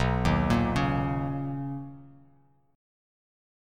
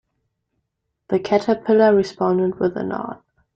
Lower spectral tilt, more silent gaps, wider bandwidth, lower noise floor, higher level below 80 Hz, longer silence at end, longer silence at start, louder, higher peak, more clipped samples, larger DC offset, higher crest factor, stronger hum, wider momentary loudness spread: about the same, -7 dB/octave vs -7.5 dB/octave; neither; first, 13 kHz vs 7.8 kHz; second, -63 dBFS vs -76 dBFS; first, -40 dBFS vs -58 dBFS; first, 1.55 s vs 0.4 s; second, 0 s vs 1.1 s; second, -28 LUFS vs -19 LUFS; second, -12 dBFS vs -4 dBFS; neither; neither; about the same, 18 dB vs 16 dB; neither; about the same, 13 LU vs 12 LU